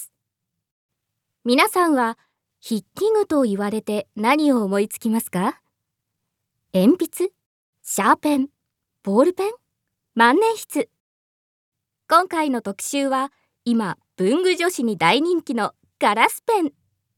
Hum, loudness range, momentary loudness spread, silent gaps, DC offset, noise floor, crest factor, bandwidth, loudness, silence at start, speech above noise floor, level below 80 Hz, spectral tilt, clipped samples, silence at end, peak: none; 3 LU; 11 LU; 0.71-0.89 s, 7.46-7.73 s, 11.00-11.72 s; under 0.1%; -81 dBFS; 22 dB; 17.5 kHz; -20 LUFS; 0 s; 61 dB; -72 dBFS; -4.5 dB/octave; under 0.1%; 0.45 s; 0 dBFS